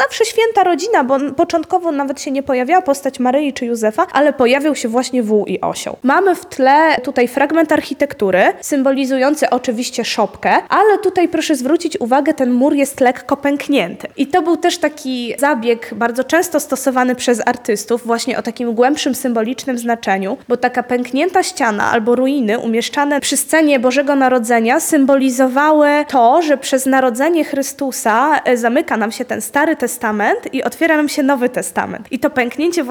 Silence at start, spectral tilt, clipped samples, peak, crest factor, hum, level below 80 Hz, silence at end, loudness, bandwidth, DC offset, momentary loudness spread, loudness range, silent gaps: 0 s; -3.5 dB/octave; under 0.1%; -2 dBFS; 14 dB; none; -58 dBFS; 0 s; -15 LUFS; 20 kHz; under 0.1%; 7 LU; 4 LU; none